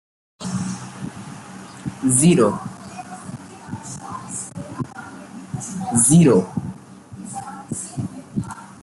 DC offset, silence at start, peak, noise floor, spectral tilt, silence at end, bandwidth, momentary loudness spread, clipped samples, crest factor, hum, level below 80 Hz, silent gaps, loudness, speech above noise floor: under 0.1%; 0.4 s; -4 dBFS; -39 dBFS; -5.5 dB/octave; 0 s; 12 kHz; 23 LU; under 0.1%; 18 dB; none; -54 dBFS; none; -20 LUFS; 25 dB